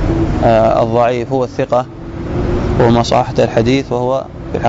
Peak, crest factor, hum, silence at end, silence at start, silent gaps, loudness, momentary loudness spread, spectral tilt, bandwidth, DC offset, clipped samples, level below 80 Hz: -2 dBFS; 10 dB; none; 0 s; 0 s; none; -14 LUFS; 9 LU; -7 dB/octave; 7.8 kHz; under 0.1%; under 0.1%; -26 dBFS